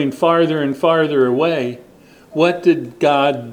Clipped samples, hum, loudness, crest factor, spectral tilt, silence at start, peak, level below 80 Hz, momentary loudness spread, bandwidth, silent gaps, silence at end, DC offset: under 0.1%; none; -16 LUFS; 14 dB; -6.5 dB/octave; 0 s; -2 dBFS; -62 dBFS; 8 LU; 15.5 kHz; none; 0 s; under 0.1%